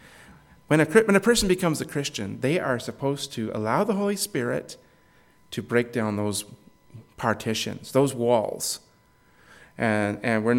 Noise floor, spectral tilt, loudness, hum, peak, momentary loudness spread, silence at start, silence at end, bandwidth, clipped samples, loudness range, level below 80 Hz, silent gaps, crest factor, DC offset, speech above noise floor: -59 dBFS; -4.5 dB/octave; -25 LUFS; none; -4 dBFS; 11 LU; 0.3 s; 0 s; 17 kHz; under 0.1%; 6 LU; -52 dBFS; none; 22 dB; under 0.1%; 35 dB